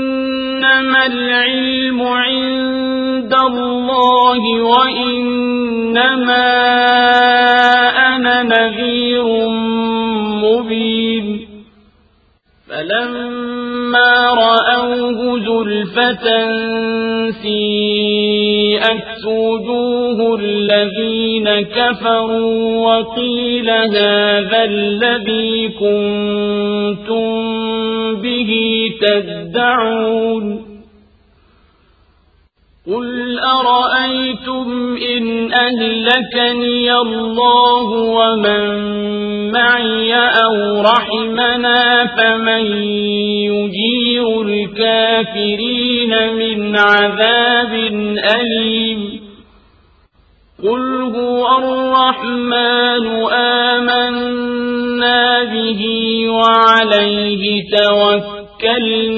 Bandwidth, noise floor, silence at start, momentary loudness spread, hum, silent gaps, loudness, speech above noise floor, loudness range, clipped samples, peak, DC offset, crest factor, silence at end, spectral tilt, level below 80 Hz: 7.2 kHz; -54 dBFS; 0 s; 8 LU; none; none; -13 LUFS; 41 dB; 6 LU; under 0.1%; 0 dBFS; under 0.1%; 14 dB; 0 s; -6 dB/octave; -50 dBFS